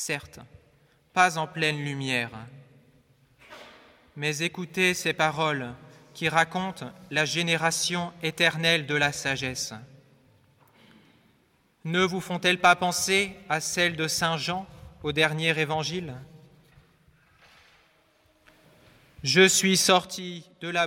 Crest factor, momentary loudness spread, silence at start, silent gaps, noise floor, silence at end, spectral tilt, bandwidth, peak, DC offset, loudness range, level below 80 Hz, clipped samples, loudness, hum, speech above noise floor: 22 dB; 15 LU; 0 s; none; -65 dBFS; 0 s; -3 dB/octave; 17 kHz; -6 dBFS; under 0.1%; 7 LU; -62 dBFS; under 0.1%; -25 LUFS; none; 40 dB